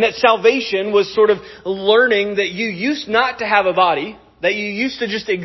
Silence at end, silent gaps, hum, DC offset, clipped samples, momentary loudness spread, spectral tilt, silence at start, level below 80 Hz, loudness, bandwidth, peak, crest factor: 0 s; none; none; under 0.1%; under 0.1%; 8 LU; -4.5 dB/octave; 0 s; -56 dBFS; -16 LUFS; 6.2 kHz; 0 dBFS; 16 dB